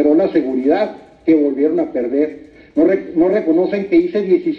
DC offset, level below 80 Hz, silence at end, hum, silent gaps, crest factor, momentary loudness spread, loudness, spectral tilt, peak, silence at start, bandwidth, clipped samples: under 0.1%; -54 dBFS; 0 s; none; none; 12 dB; 5 LU; -16 LUFS; -9 dB/octave; -4 dBFS; 0 s; 5.4 kHz; under 0.1%